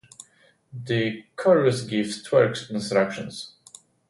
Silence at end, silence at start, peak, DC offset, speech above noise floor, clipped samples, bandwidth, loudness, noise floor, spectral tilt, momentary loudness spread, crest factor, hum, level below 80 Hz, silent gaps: 0.6 s; 0.75 s; -6 dBFS; under 0.1%; 36 dB; under 0.1%; 11.5 kHz; -23 LUFS; -60 dBFS; -5.5 dB/octave; 18 LU; 18 dB; none; -64 dBFS; none